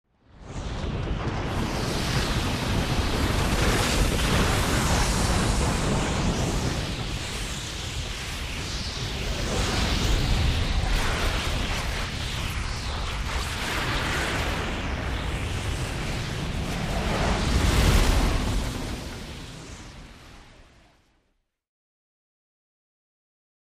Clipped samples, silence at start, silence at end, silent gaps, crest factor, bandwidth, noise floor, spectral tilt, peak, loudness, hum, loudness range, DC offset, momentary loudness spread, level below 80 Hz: under 0.1%; 0.35 s; 3.1 s; none; 18 dB; 15.5 kHz; -73 dBFS; -4.5 dB/octave; -8 dBFS; -26 LUFS; none; 6 LU; under 0.1%; 9 LU; -30 dBFS